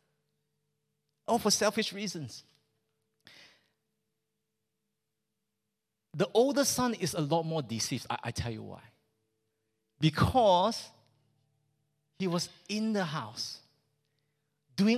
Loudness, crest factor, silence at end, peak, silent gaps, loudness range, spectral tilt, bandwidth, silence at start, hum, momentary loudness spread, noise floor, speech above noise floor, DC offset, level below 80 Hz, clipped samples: -30 LUFS; 20 dB; 0 s; -12 dBFS; none; 6 LU; -4.5 dB/octave; 15.5 kHz; 1.3 s; none; 17 LU; -86 dBFS; 56 dB; under 0.1%; -56 dBFS; under 0.1%